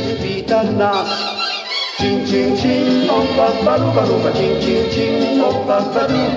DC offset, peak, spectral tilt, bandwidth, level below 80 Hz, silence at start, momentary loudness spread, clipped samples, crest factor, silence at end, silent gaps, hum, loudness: under 0.1%; -2 dBFS; -6 dB/octave; 7.8 kHz; -40 dBFS; 0 s; 4 LU; under 0.1%; 14 dB; 0 s; none; none; -16 LUFS